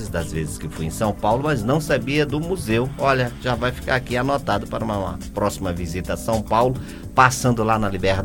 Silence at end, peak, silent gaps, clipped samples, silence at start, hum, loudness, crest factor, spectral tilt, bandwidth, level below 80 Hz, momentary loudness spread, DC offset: 0 s; 0 dBFS; none; under 0.1%; 0 s; none; -22 LUFS; 22 dB; -5.5 dB/octave; 17 kHz; -36 dBFS; 8 LU; under 0.1%